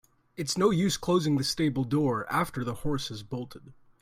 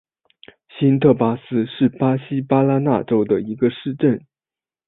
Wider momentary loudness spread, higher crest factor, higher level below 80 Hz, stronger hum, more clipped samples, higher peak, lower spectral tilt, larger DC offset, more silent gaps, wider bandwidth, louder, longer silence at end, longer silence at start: first, 13 LU vs 6 LU; about the same, 16 dB vs 18 dB; about the same, -52 dBFS vs -56 dBFS; neither; neither; second, -12 dBFS vs -2 dBFS; second, -5 dB/octave vs -13 dB/octave; neither; neither; first, 16 kHz vs 4 kHz; second, -28 LUFS vs -19 LUFS; second, 0.3 s vs 0.7 s; second, 0.4 s vs 0.75 s